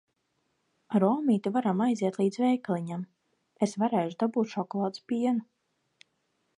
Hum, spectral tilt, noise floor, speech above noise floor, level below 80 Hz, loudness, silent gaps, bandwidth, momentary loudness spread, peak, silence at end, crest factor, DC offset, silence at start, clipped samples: none; -7 dB/octave; -76 dBFS; 49 dB; -82 dBFS; -29 LUFS; none; 11 kHz; 7 LU; -10 dBFS; 1.15 s; 18 dB; under 0.1%; 0.9 s; under 0.1%